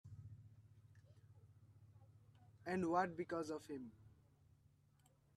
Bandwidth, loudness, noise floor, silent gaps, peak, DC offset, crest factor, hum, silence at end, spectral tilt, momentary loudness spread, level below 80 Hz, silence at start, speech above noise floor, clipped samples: 13 kHz; -44 LUFS; -74 dBFS; none; -26 dBFS; under 0.1%; 24 dB; none; 1.25 s; -6.5 dB/octave; 28 LU; -80 dBFS; 0.05 s; 31 dB; under 0.1%